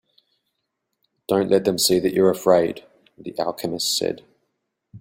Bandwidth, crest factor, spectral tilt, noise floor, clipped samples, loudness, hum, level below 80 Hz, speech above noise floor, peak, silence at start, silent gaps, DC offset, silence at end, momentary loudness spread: 16.5 kHz; 20 dB; -4 dB/octave; -78 dBFS; under 0.1%; -20 LUFS; none; -60 dBFS; 57 dB; -4 dBFS; 1.3 s; none; under 0.1%; 0 s; 18 LU